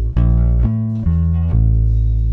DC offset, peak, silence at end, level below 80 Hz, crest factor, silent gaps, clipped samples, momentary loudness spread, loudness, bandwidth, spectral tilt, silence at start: under 0.1%; -4 dBFS; 0 s; -16 dBFS; 10 dB; none; under 0.1%; 3 LU; -16 LUFS; 2.7 kHz; -12 dB/octave; 0 s